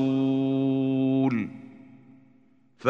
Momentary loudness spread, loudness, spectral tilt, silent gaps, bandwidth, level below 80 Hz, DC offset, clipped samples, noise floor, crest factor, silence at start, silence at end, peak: 10 LU; -25 LUFS; -9 dB/octave; none; 5.4 kHz; -70 dBFS; under 0.1%; under 0.1%; -61 dBFS; 22 dB; 0 s; 0 s; -4 dBFS